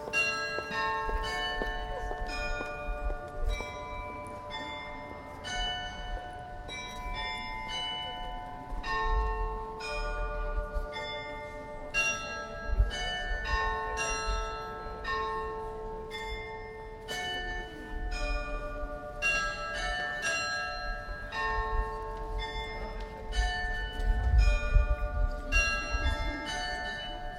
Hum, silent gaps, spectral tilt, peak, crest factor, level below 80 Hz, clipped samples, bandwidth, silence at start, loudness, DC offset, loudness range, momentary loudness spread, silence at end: none; none; -3.5 dB/octave; -12 dBFS; 22 dB; -36 dBFS; under 0.1%; 12 kHz; 0 s; -34 LUFS; under 0.1%; 7 LU; 11 LU; 0 s